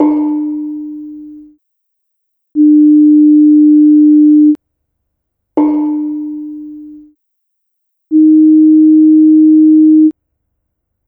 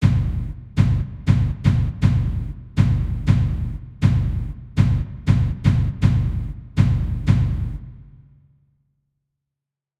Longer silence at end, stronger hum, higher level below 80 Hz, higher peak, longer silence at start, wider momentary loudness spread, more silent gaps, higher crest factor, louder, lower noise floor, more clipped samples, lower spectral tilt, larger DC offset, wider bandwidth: second, 0.95 s vs 2.05 s; neither; second, -62 dBFS vs -28 dBFS; first, 0 dBFS vs -4 dBFS; about the same, 0 s vs 0 s; first, 18 LU vs 9 LU; neither; second, 10 dB vs 18 dB; first, -7 LUFS vs -21 LUFS; second, -70 dBFS vs -86 dBFS; neither; first, -11 dB/octave vs -8.5 dB/octave; neither; second, 2.2 kHz vs 8.6 kHz